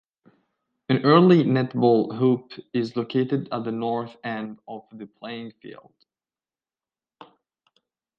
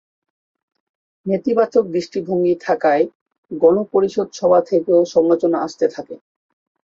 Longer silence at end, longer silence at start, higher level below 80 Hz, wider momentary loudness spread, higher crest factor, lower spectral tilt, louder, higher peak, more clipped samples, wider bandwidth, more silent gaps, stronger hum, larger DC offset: first, 2.45 s vs 0.7 s; second, 0.9 s vs 1.25 s; second, -70 dBFS vs -64 dBFS; first, 23 LU vs 8 LU; first, 22 dB vs 16 dB; first, -9 dB/octave vs -6.5 dB/octave; second, -22 LUFS vs -17 LUFS; about the same, -2 dBFS vs -2 dBFS; neither; about the same, 7 kHz vs 7.4 kHz; second, none vs 3.15-3.26 s, 3.38-3.43 s; neither; neither